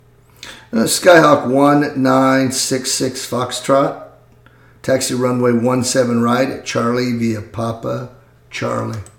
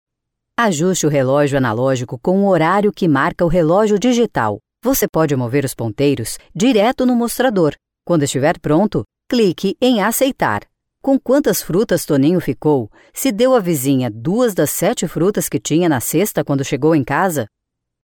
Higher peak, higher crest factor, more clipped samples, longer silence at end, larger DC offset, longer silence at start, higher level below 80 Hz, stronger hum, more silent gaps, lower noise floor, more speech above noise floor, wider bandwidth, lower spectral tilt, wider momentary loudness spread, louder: about the same, 0 dBFS vs -2 dBFS; about the same, 16 dB vs 14 dB; neither; second, 0.15 s vs 0.55 s; neither; second, 0.45 s vs 0.6 s; second, -54 dBFS vs -44 dBFS; neither; second, none vs 5.09-5.13 s; second, -47 dBFS vs -77 dBFS; second, 32 dB vs 62 dB; about the same, 19 kHz vs 18 kHz; about the same, -4.5 dB/octave vs -5.5 dB/octave; first, 12 LU vs 6 LU; about the same, -15 LUFS vs -16 LUFS